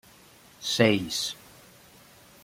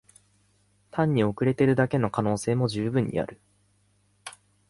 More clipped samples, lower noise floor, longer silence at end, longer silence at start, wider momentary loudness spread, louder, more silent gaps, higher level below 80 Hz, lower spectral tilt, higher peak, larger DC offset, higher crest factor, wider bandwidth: neither; second, -54 dBFS vs -66 dBFS; first, 1.1 s vs 0.4 s; second, 0.6 s vs 0.95 s; second, 13 LU vs 21 LU; about the same, -26 LUFS vs -26 LUFS; neither; second, -64 dBFS vs -58 dBFS; second, -4 dB/octave vs -7 dB/octave; first, -4 dBFS vs -8 dBFS; neither; first, 26 dB vs 18 dB; first, 16.5 kHz vs 11.5 kHz